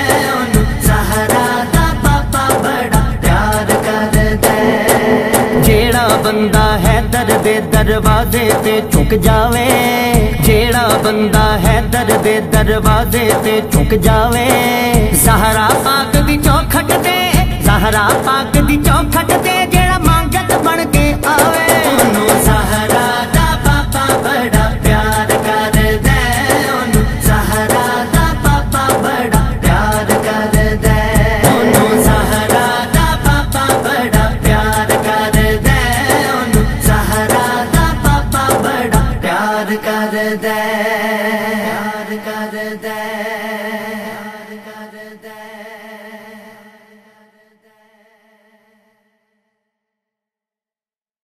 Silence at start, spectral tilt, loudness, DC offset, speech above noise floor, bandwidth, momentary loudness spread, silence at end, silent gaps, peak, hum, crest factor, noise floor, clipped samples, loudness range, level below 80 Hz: 0 s; -4.5 dB/octave; -12 LUFS; under 0.1%; over 79 dB; 15.5 kHz; 6 LU; 4.85 s; none; 0 dBFS; none; 12 dB; under -90 dBFS; under 0.1%; 6 LU; -20 dBFS